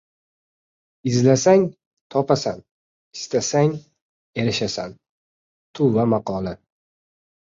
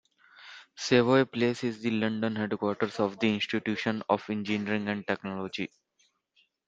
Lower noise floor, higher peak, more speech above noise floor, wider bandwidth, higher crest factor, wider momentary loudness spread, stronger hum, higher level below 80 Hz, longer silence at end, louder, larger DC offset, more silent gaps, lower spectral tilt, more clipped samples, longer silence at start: first, under -90 dBFS vs -72 dBFS; first, -2 dBFS vs -8 dBFS; first, over 71 dB vs 43 dB; about the same, 7.8 kHz vs 7.8 kHz; about the same, 20 dB vs 22 dB; first, 18 LU vs 12 LU; neither; first, -56 dBFS vs -70 dBFS; about the same, 0.95 s vs 1 s; first, -21 LUFS vs -29 LUFS; neither; first, 1.87-2.10 s, 2.71-3.11 s, 4.02-4.33 s, 5.09-5.74 s vs none; about the same, -5.5 dB/octave vs -5.5 dB/octave; neither; first, 1.05 s vs 0.4 s